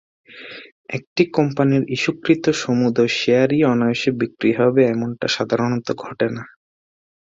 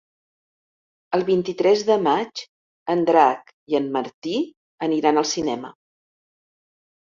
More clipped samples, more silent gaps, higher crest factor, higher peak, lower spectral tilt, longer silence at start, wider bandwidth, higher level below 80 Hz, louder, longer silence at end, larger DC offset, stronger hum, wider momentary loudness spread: neither; second, 0.72-0.84 s, 1.07-1.16 s vs 2.49-2.86 s, 3.53-3.67 s, 4.14-4.22 s, 4.57-4.78 s; about the same, 18 dB vs 20 dB; about the same, -2 dBFS vs -2 dBFS; first, -6 dB/octave vs -4.5 dB/octave; second, 0.3 s vs 1.1 s; about the same, 7.8 kHz vs 7.6 kHz; first, -60 dBFS vs -66 dBFS; about the same, -19 LUFS vs -21 LUFS; second, 0.9 s vs 1.3 s; neither; neither; about the same, 14 LU vs 14 LU